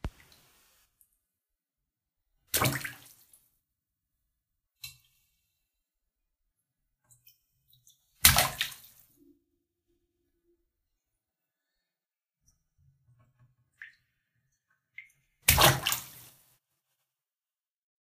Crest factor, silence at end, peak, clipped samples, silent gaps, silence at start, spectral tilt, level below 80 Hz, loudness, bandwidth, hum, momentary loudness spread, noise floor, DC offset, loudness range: 34 dB; 1.95 s; -2 dBFS; under 0.1%; none; 0.05 s; -2 dB/octave; -50 dBFS; -25 LUFS; 15.5 kHz; none; 26 LU; under -90 dBFS; under 0.1%; 8 LU